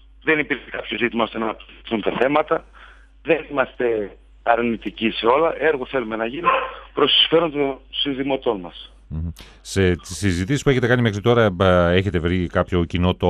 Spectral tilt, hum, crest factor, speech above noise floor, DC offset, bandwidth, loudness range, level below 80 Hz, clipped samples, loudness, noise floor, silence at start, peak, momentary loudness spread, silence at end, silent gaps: -5.5 dB/octave; none; 20 dB; 25 dB; under 0.1%; 13.5 kHz; 4 LU; -44 dBFS; under 0.1%; -20 LUFS; -45 dBFS; 0.25 s; -2 dBFS; 12 LU; 0 s; none